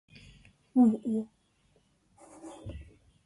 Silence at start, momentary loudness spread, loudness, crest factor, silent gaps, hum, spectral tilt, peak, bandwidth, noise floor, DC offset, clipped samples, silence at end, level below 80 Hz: 0.75 s; 24 LU; -28 LUFS; 18 dB; none; none; -8.5 dB/octave; -14 dBFS; 11 kHz; -69 dBFS; under 0.1%; under 0.1%; 0.4 s; -58 dBFS